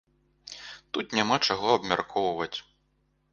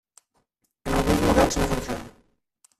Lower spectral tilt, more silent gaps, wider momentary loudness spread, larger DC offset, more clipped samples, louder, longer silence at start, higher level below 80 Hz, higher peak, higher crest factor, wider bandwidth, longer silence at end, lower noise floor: second, -3.5 dB/octave vs -5 dB/octave; neither; first, 18 LU vs 14 LU; neither; neither; second, -27 LUFS vs -23 LUFS; second, 0.45 s vs 0.85 s; second, -64 dBFS vs -36 dBFS; about the same, -6 dBFS vs -6 dBFS; about the same, 22 dB vs 20 dB; second, 9.4 kHz vs 15 kHz; about the same, 0.7 s vs 0.7 s; about the same, -71 dBFS vs -72 dBFS